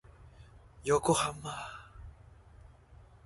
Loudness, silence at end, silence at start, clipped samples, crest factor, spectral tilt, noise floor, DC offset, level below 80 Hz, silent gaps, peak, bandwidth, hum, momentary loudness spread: -32 LUFS; 0.3 s; 0.2 s; under 0.1%; 22 dB; -4 dB/octave; -57 dBFS; under 0.1%; -56 dBFS; none; -14 dBFS; 11.5 kHz; none; 25 LU